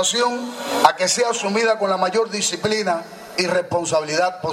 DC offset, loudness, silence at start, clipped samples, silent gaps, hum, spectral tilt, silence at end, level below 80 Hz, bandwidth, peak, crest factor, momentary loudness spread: under 0.1%; -20 LUFS; 0 s; under 0.1%; none; none; -2.5 dB/octave; 0 s; -64 dBFS; 16 kHz; 0 dBFS; 20 dB; 7 LU